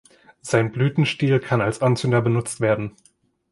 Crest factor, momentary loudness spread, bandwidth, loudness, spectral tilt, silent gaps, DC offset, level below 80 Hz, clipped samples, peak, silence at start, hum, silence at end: 18 dB; 4 LU; 11.5 kHz; -21 LUFS; -6 dB/octave; none; under 0.1%; -54 dBFS; under 0.1%; -4 dBFS; 0.45 s; none; 0.65 s